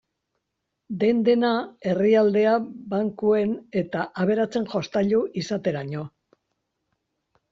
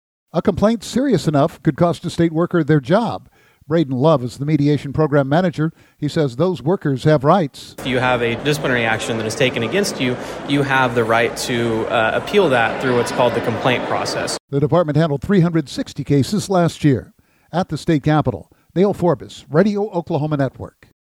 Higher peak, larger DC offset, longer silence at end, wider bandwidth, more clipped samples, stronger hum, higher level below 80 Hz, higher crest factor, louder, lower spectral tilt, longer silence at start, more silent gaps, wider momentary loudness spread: second, -8 dBFS vs 0 dBFS; neither; first, 1.45 s vs 0.5 s; second, 7.6 kHz vs 16.5 kHz; neither; neither; second, -64 dBFS vs -48 dBFS; about the same, 16 dB vs 16 dB; second, -23 LUFS vs -18 LUFS; about the same, -5.5 dB/octave vs -6 dB/octave; first, 0.9 s vs 0.35 s; second, none vs 14.40-14.48 s; first, 10 LU vs 7 LU